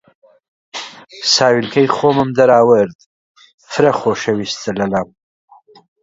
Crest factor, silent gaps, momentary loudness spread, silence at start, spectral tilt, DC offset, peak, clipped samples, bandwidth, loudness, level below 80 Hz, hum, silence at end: 16 dB; 2.95-2.99 s, 3.06-3.35 s, 3.54-3.58 s; 18 LU; 0.75 s; -4.5 dB/octave; under 0.1%; 0 dBFS; under 0.1%; 7.8 kHz; -14 LUFS; -54 dBFS; none; 1 s